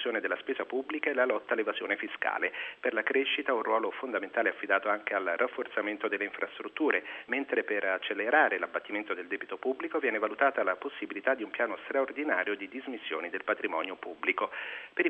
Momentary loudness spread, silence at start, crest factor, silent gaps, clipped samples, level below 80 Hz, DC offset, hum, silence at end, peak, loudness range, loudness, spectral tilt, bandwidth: 7 LU; 0 s; 22 dB; none; under 0.1%; -82 dBFS; under 0.1%; none; 0 s; -10 dBFS; 2 LU; -31 LUFS; -5.5 dB/octave; 4.7 kHz